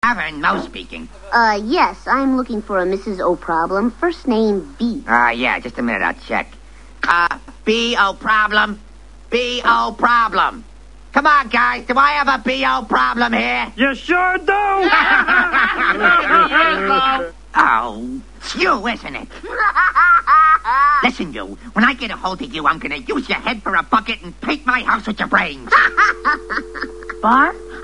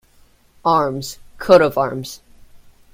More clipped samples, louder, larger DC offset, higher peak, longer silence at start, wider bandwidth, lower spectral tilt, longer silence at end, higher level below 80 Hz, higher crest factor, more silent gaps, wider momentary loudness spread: neither; about the same, -15 LUFS vs -17 LUFS; first, 0.7% vs under 0.1%; about the same, 0 dBFS vs 0 dBFS; second, 0.05 s vs 0.65 s; second, 10.5 kHz vs 16.5 kHz; second, -4 dB/octave vs -5.5 dB/octave; second, 0 s vs 0.35 s; first, -40 dBFS vs -50 dBFS; about the same, 16 dB vs 20 dB; neither; second, 11 LU vs 19 LU